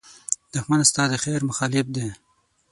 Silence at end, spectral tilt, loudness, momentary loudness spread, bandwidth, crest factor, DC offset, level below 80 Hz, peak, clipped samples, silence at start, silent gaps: 0.55 s; -3.5 dB/octave; -22 LUFS; 10 LU; 11.5 kHz; 22 dB; under 0.1%; -58 dBFS; -2 dBFS; under 0.1%; 0.05 s; none